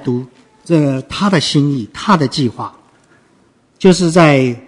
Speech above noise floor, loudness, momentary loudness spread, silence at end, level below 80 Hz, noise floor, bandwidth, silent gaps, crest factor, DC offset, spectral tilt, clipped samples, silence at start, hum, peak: 40 dB; -13 LUFS; 11 LU; 0.05 s; -48 dBFS; -53 dBFS; 11 kHz; none; 14 dB; under 0.1%; -6 dB/octave; 0.1%; 0 s; none; 0 dBFS